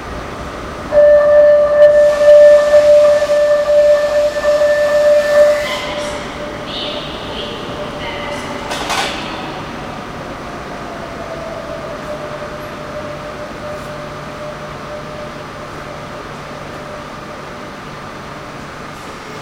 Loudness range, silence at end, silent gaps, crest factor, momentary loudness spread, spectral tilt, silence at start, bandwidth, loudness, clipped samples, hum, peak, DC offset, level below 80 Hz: 19 LU; 0 s; none; 14 dB; 20 LU; -4 dB/octave; 0 s; 13 kHz; -12 LUFS; under 0.1%; none; 0 dBFS; under 0.1%; -40 dBFS